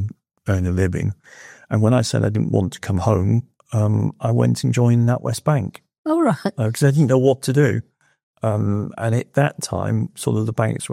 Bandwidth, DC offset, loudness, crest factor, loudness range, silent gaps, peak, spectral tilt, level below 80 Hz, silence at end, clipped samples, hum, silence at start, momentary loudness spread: 14 kHz; under 0.1%; -20 LUFS; 16 dB; 3 LU; 5.98-6.04 s, 8.23-8.34 s; -2 dBFS; -7 dB/octave; -54 dBFS; 0 s; under 0.1%; none; 0 s; 8 LU